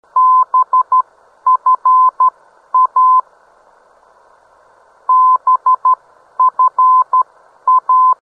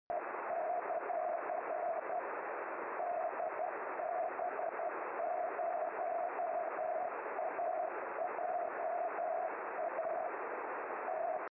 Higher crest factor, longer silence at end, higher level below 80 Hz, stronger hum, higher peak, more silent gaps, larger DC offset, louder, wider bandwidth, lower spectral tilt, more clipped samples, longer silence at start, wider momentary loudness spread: about the same, 8 dB vs 10 dB; about the same, 0.1 s vs 0.05 s; first, -74 dBFS vs -88 dBFS; neither; first, -4 dBFS vs -28 dBFS; neither; neither; first, -12 LUFS vs -39 LUFS; second, 1.7 kHz vs 3 kHz; about the same, -3.5 dB/octave vs -4 dB/octave; neither; about the same, 0.15 s vs 0.1 s; first, 9 LU vs 3 LU